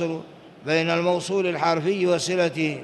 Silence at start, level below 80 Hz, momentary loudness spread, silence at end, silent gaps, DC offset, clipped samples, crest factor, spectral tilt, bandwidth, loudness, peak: 0 s; -68 dBFS; 6 LU; 0 s; none; under 0.1%; under 0.1%; 16 dB; -5 dB/octave; 12 kHz; -23 LUFS; -8 dBFS